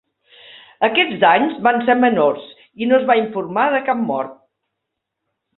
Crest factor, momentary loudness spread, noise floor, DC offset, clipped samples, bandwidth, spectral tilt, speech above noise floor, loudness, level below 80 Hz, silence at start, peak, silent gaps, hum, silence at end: 18 dB; 9 LU; -78 dBFS; under 0.1%; under 0.1%; 4.2 kHz; -9.5 dB/octave; 62 dB; -16 LUFS; -64 dBFS; 0.55 s; 0 dBFS; none; none; 1.25 s